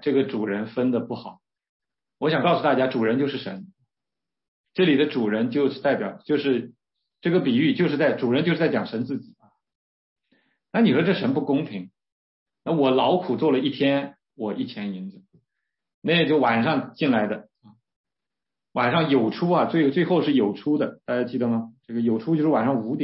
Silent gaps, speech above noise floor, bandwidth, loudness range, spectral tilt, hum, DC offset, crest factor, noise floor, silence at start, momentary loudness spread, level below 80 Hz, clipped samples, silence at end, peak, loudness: 1.69-1.80 s, 4.48-4.64 s, 9.75-10.16 s, 12.12-12.46 s, 15.94-16.02 s, 17.96-18.04 s; 67 dB; 5.8 kHz; 3 LU; -11 dB/octave; none; under 0.1%; 16 dB; -89 dBFS; 0 s; 13 LU; -70 dBFS; under 0.1%; 0 s; -8 dBFS; -23 LUFS